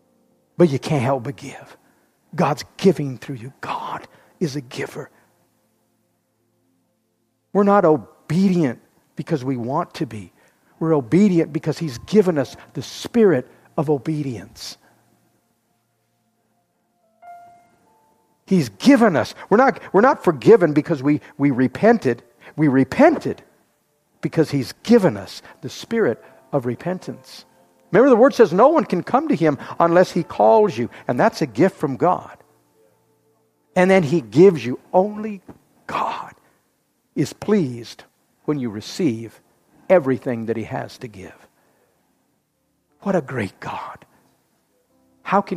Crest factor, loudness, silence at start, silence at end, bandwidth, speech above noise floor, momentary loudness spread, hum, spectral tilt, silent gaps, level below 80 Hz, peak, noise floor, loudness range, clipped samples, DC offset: 20 dB; -19 LUFS; 0.6 s; 0 s; 15 kHz; 50 dB; 19 LU; none; -7 dB/octave; none; -62 dBFS; 0 dBFS; -69 dBFS; 13 LU; under 0.1%; under 0.1%